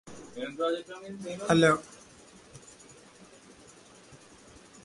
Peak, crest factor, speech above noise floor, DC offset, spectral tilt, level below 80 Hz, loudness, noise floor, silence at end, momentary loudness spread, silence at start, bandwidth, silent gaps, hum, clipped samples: -10 dBFS; 24 dB; 26 dB; under 0.1%; -5 dB/octave; -64 dBFS; -28 LUFS; -54 dBFS; 0.7 s; 29 LU; 0.05 s; 11.5 kHz; none; none; under 0.1%